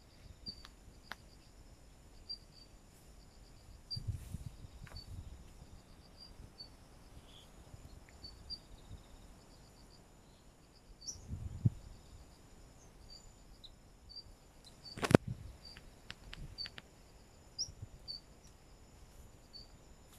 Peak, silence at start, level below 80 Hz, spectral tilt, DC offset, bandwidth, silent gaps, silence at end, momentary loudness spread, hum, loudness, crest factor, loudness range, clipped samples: -4 dBFS; 0 s; -58 dBFS; -5.5 dB/octave; under 0.1%; 15 kHz; none; 0 s; 18 LU; none; -42 LUFS; 40 dB; 16 LU; under 0.1%